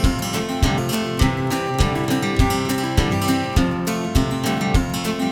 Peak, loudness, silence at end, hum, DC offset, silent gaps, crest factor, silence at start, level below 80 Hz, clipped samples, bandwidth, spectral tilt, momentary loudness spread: -2 dBFS; -20 LUFS; 0 s; none; under 0.1%; none; 16 dB; 0 s; -26 dBFS; under 0.1%; 19.5 kHz; -5 dB/octave; 3 LU